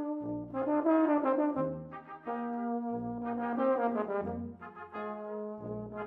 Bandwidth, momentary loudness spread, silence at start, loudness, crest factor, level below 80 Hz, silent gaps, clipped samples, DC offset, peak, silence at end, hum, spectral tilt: 4 kHz; 14 LU; 0 s; -33 LUFS; 16 dB; -66 dBFS; none; under 0.1%; under 0.1%; -16 dBFS; 0 s; none; -10.5 dB/octave